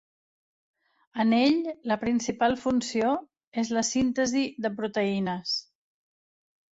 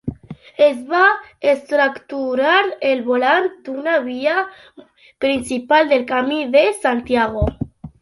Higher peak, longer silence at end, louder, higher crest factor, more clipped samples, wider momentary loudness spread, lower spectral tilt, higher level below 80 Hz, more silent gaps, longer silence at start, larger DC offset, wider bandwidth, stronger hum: second, -12 dBFS vs -2 dBFS; first, 1.15 s vs 0.15 s; second, -27 LUFS vs -17 LUFS; about the same, 16 dB vs 16 dB; neither; about the same, 8 LU vs 10 LU; about the same, -4 dB/octave vs -5 dB/octave; second, -62 dBFS vs -40 dBFS; first, 3.47-3.52 s vs none; first, 1.15 s vs 0.05 s; neither; second, 8 kHz vs 11.5 kHz; neither